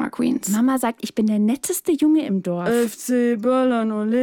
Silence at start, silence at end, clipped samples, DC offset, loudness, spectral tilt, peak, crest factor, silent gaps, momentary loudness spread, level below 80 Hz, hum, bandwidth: 0 s; 0 s; under 0.1%; under 0.1%; -20 LUFS; -5.5 dB/octave; -10 dBFS; 10 dB; none; 5 LU; -62 dBFS; none; 18 kHz